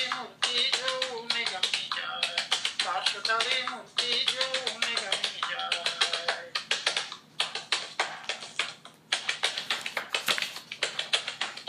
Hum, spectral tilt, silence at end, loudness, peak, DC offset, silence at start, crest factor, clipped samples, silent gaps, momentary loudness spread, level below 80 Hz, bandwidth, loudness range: none; 1 dB/octave; 0 s; -28 LUFS; -10 dBFS; under 0.1%; 0 s; 20 dB; under 0.1%; none; 7 LU; -82 dBFS; 15.5 kHz; 3 LU